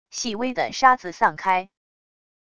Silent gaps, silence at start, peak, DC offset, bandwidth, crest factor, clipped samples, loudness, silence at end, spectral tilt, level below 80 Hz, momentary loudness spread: none; 0.1 s; -2 dBFS; under 0.1%; 11 kHz; 22 dB; under 0.1%; -22 LUFS; 0.75 s; -2.5 dB/octave; -60 dBFS; 8 LU